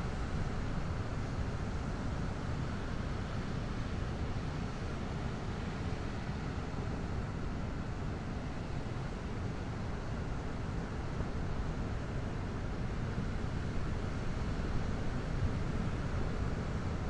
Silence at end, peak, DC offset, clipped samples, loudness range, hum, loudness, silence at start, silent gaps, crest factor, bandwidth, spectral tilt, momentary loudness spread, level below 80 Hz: 0 s; -22 dBFS; under 0.1%; under 0.1%; 2 LU; none; -39 LUFS; 0 s; none; 14 dB; 10.5 kHz; -7 dB/octave; 3 LU; -42 dBFS